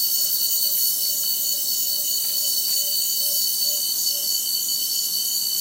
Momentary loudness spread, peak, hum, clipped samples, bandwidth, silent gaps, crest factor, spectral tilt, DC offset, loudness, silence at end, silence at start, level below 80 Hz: 2 LU; -8 dBFS; none; under 0.1%; 16 kHz; none; 14 dB; 2.5 dB/octave; under 0.1%; -19 LUFS; 0 s; 0 s; -82 dBFS